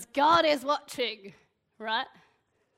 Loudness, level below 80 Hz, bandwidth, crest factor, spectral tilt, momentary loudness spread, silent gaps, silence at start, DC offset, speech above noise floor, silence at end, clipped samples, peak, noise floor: -27 LUFS; -66 dBFS; 16 kHz; 18 dB; -3 dB/octave; 19 LU; none; 0 s; under 0.1%; 44 dB; 0.7 s; under 0.1%; -10 dBFS; -71 dBFS